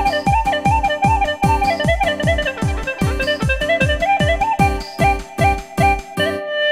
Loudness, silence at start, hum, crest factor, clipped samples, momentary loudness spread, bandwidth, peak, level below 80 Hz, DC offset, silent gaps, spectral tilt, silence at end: -17 LUFS; 0 s; none; 14 dB; under 0.1%; 4 LU; 16 kHz; -2 dBFS; -26 dBFS; 0.3%; none; -5.5 dB/octave; 0 s